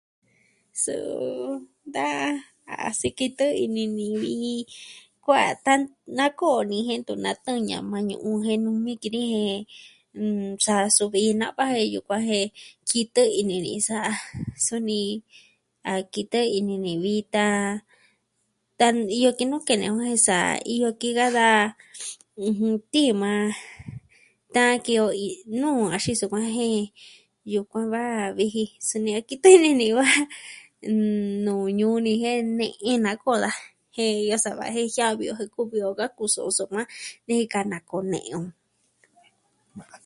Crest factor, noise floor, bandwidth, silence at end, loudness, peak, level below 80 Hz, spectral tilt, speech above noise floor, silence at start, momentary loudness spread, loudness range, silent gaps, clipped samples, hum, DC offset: 24 dB; -73 dBFS; 11.5 kHz; 0.1 s; -24 LUFS; 0 dBFS; -64 dBFS; -3.5 dB/octave; 50 dB; 0.75 s; 13 LU; 7 LU; none; under 0.1%; none; under 0.1%